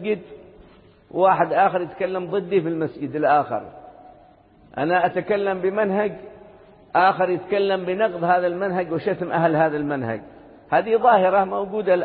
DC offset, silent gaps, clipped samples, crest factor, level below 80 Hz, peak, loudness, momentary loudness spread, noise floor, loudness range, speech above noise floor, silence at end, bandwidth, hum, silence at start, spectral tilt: under 0.1%; none; under 0.1%; 18 dB; -60 dBFS; -4 dBFS; -21 LUFS; 10 LU; -52 dBFS; 3 LU; 31 dB; 0 s; 4.7 kHz; none; 0 s; -11 dB/octave